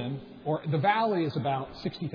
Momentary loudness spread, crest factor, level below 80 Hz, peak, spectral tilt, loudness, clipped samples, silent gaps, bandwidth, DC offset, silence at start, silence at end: 11 LU; 16 dB; -60 dBFS; -14 dBFS; -8.5 dB/octave; -29 LUFS; under 0.1%; none; 5.4 kHz; under 0.1%; 0 s; 0 s